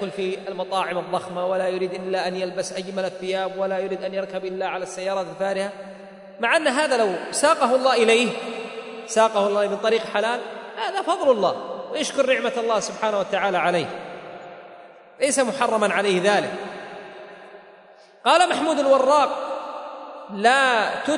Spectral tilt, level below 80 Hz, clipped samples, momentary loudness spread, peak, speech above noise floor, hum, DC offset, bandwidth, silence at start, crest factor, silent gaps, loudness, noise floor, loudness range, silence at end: -3 dB/octave; -74 dBFS; under 0.1%; 17 LU; -4 dBFS; 28 dB; none; under 0.1%; 11 kHz; 0 s; 18 dB; none; -22 LUFS; -49 dBFS; 6 LU; 0 s